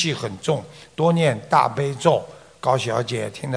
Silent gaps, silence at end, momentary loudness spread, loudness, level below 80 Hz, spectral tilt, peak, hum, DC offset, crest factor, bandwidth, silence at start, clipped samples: none; 0 s; 9 LU; -21 LUFS; -60 dBFS; -5.5 dB/octave; 0 dBFS; none; under 0.1%; 20 dB; 10.5 kHz; 0 s; under 0.1%